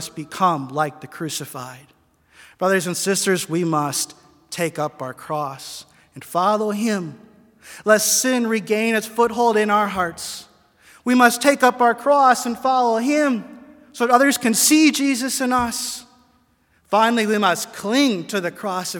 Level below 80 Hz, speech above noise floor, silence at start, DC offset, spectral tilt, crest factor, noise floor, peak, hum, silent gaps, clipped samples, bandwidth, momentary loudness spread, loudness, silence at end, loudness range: -60 dBFS; 42 dB; 0 s; under 0.1%; -3 dB/octave; 20 dB; -61 dBFS; 0 dBFS; none; none; under 0.1%; 18 kHz; 14 LU; -19 LUFS; 0 s; 7 LU